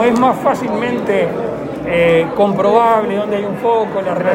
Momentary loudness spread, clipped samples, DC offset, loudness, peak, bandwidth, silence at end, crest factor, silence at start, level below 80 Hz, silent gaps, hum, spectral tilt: 7 LU; under 0.1%; under 0.1%; -15 LUFS; 0 dBFS; 16.5 kHz; 0 s; 14 dB; 0 s; -46 dBFS; none; none; -6.5 dB/octave